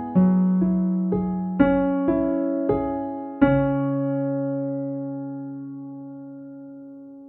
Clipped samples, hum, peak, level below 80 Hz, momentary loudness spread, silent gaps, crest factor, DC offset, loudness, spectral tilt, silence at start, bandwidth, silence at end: under 0.1%; none; -4 dBFS; -46 dBFS; 19 LU; none; 20 dB; under 0.1%; -23 LUFS; -9.5 dB/octave; 0 s; 3.7 kHz; 0 s